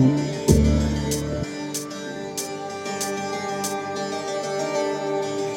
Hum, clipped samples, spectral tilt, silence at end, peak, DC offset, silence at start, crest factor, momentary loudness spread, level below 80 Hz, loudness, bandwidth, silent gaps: none; under 0.1%; -5 dB/octave; 0 s; -2 dBFS; under 0.1%; 0 s; 22 dB; 10 LU; -34 dBFS; -25 LUFS; 16.5 kHz; none